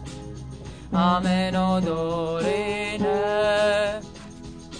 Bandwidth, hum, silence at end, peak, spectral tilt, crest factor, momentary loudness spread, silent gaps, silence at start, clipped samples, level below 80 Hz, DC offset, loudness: 10 kHz; none; 0 s; -8 dBFS; -6 dB/octave; 16 dB; 18 LU; none; 0 s; under 0.1%; -46 dBFS; 0.2%; -23 LUFS